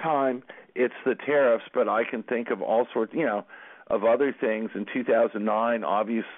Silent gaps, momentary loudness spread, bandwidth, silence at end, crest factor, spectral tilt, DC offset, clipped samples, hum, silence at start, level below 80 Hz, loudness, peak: none; 8 LU; 3.9 kHz; 0 s; 14 dB; -10 dB/octave; under 0.1%; under 0.1%; none; 0 s; -74 dBFS; -26 LUFS; -12 dBFS